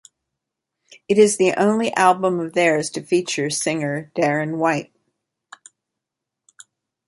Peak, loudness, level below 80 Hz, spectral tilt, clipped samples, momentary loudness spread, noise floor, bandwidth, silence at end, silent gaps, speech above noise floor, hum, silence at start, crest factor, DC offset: -2 dBFS; -19 LUFS; -66 dBFS; -4.5 dB/octave; under 0.1%; 7 LU; -84 dBFS; 11.5 kHz; 2.25 s; none; 65 dB; none; 1.1 s; 20 dB; under 0.1%